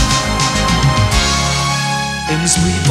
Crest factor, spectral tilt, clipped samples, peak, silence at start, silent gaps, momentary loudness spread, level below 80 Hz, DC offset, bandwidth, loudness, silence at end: 14 dB; -3.5 dB/octave; under 0.1%; 0 dBFS; 0 s; none; 4 LU; -24 dBFS; under 0.1%; 15.5 kHz; -14 LUFS; 0 s